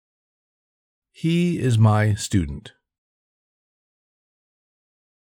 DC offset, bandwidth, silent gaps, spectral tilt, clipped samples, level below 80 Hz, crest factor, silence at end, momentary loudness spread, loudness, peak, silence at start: under 0.1%; 11.5 kHz; none; -6.5 dB/octave; under 0.1%; -46 dBFS; 18 dB; 2.55 s; 12 LU; -21 LUFS; -8 dBFS; 1.25 s